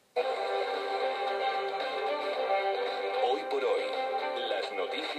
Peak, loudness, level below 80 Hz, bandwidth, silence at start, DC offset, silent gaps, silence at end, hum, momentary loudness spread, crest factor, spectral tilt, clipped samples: -16 dBFS; -31 LUFS; under -90 dBFS; 12.5 kHz; 0.15 s; under 0.1%; none; 0 s; none; 3 LU; 14 dB; -2 dB/octave; under 0.1%